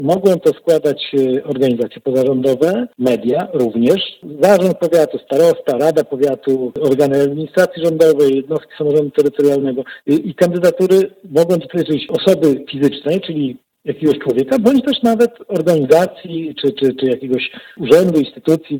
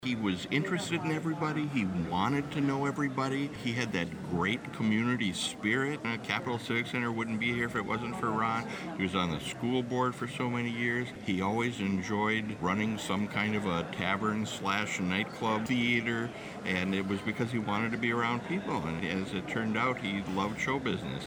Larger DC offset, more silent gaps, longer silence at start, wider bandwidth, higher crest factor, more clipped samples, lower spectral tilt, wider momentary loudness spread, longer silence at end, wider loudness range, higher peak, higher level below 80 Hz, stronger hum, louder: neither; neither; about the same, 0 s vs 0 s; about the same, 19 kHz vs over 20 kHz; about the same, 14 dB vs 18 dB; neither; about the same, -6.5 dB/octave vs -5.5 dB/octave; first, 7 LU vs 4 LU; about the same, 0 s vs 0 s; about the same, 2 LU vs 1 LU; first, 0 dBFS vs -14 dBFS; about the same, -58 dBFS vs -60 dBFS; neither; first, -15 LUFS vs -32 LUFS